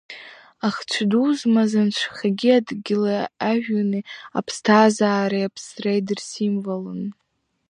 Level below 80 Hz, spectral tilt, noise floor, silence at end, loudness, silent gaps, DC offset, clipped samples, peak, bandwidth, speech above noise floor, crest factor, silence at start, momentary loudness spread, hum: -70 dBFS; -5.5 dB/octave; -42 dBFS; 0.55 s; -21 LUFS; none; under 0.1%; under 0.1%; 0 dBFS; 10.5 kHz; 21 dB; 20 dB; 0.1 s; 11 LU; none